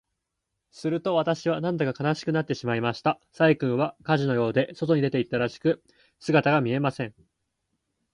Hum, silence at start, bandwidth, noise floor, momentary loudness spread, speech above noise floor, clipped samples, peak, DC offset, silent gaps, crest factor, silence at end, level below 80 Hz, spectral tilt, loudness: none; 0.75 s; 11 kHz; -82 dBFS; 6 LU; 57 dB; under 0.1%; -6 dBFS; under 0.1%; none; 20 dB; 1.05 s; -64 dBFS; -7 dB/octave; -25 LUFS